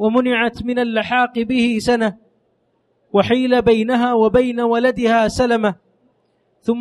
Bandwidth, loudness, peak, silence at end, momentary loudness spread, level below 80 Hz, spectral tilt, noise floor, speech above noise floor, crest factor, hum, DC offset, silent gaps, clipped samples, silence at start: 12 kHz; -17 LUFS; -2 dBFS; 0 s; 6 LU; -44 dBFS; -5.5 dB/octave; -64 dBFS; 48 dB; 16 dB; none; under 0.1%; none; under 0.1%; 0 s